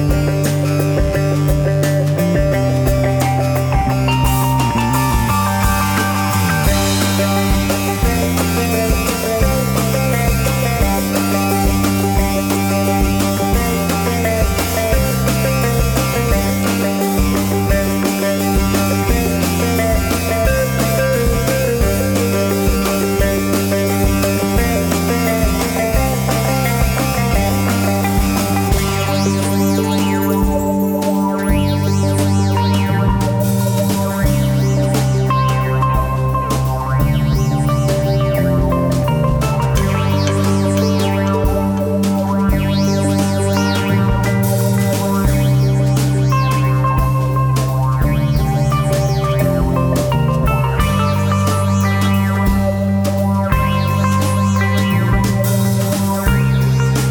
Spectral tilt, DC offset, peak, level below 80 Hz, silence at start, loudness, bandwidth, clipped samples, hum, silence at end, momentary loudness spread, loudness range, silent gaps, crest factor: -6 dB/octave; under 0.1%; -2 dBFS; -24 dBFS; 0 s; -15 LUFS; 20 kHz; under 0.1%; none; 0 s; 1 LU; 1 LU; none; 12 dB